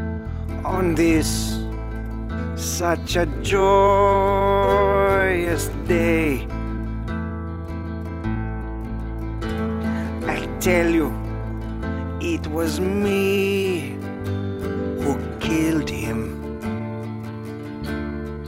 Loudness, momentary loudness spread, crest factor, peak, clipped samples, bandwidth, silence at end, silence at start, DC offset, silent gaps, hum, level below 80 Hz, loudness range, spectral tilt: -23 LUFS; 13 LU; 18 dB; -4 dBFS; under 0.1%; 16 kHz; 0 s; 0 s; under 0.1%; none; none; -32 dBFS; 8 LU; -5.5 dB/octave